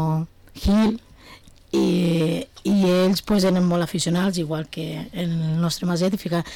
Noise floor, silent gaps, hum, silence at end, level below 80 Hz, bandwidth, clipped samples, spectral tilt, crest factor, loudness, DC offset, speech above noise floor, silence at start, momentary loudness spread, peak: -47 dBFS; none; none; 0 s; -40 dBFS; 17 kHz; under 0.1%; -6 dB/octave; 8 dB; -22 LUFS; under 0.1%; 26 dB; 0 s; 9 LU; -14 dBFS